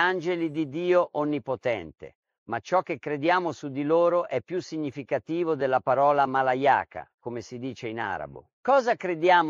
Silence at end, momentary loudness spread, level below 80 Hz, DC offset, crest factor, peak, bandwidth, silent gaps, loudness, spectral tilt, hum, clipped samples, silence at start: 0 s; 13 LU; -68 dBFS; under 0.1%; 18 dB; -8 dBFS; 7.4 kHz; 2.15-2.23 s, 2.38-2.46 s, 7.14-7.18 s, 8.53-8.63 s; -26 LUFS; -6 dB/octave; none; under 0.1%; 0 s